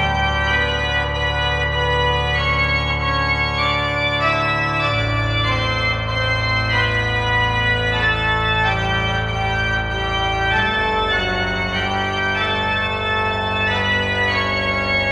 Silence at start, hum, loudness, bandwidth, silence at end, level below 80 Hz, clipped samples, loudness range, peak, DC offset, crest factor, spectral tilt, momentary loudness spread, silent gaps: 0 s; none; -18 LUFS; 9.8 kHz; 0 s; -30 dBFS; under 0.1%; 1 LU; -6 dBFS; under 0.1%; 14 dB; -5 dB/octave; 3 LU; none